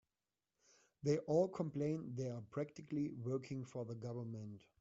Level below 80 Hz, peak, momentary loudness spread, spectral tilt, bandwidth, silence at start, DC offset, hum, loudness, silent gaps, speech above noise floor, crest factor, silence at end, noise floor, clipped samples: -78 dBFS; -24 dBFS; 11 LU; -8.5 dB/octave; 8 kHz; 1.05 s; under 0.1%; none; -42 LUFS; none; over 49 dB; 20 dB; 0.2 s; under -90 dBFS; under 0.1%